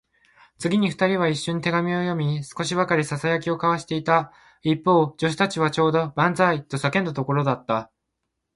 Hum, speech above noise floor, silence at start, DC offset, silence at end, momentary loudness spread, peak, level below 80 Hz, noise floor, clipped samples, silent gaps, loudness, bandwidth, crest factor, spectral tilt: none; 57 dB; 0.6 s; under 0.1%; 0.7 s; 6 LU; -4 dBFS; -60 dBFS; -79 dBFS; under 0.1%; none; -23 LUFS; 11.5 kHz; 20 dB; -6 dB/octave